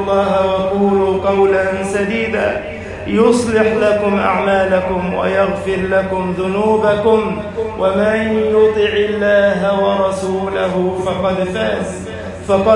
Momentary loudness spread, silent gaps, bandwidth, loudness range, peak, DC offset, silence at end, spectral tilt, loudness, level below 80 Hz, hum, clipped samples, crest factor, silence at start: 6 LU; none; 11.5 kHz; 2 LU; -2 dBFS; under 0.1%; 0 s; -6 dB/octave; -15 LUFS; -42 dBFS; none; under 0.1%; 14 dB; 0 s